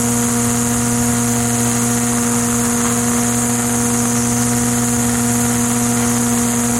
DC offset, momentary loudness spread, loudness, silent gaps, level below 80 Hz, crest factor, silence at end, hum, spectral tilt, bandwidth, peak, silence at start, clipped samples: 0.3%; 0 LU; -15 LUFS; none; -38 dBFS; 12 dB; 0 s; none; -4 dB/octave; 16.5 kHz; -2 dBFS; 0 s; under 0.1%